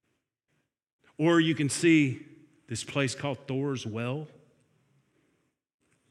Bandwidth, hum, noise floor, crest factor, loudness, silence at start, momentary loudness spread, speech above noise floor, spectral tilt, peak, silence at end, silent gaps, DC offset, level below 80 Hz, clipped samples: 12.5 kHz; none; -79 dBFS; 20 dB; -28 LUFS; 1.2 s; 15 LU; 52 dB; -5 dB/octave; -12 dBFS; 1.85 s; none; under 0.1%; -74 dBFS; under 0.1%